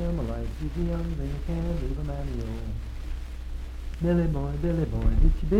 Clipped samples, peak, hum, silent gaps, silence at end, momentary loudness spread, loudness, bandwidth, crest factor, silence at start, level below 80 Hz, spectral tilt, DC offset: under 0.1%; -10 dBFS; none; none; 0 s; 13 LU; -30 LUFS; 8.6 kHz; 16 dB; 0 s; -28 dBFS; -8.5 dB/octave; under 0.1%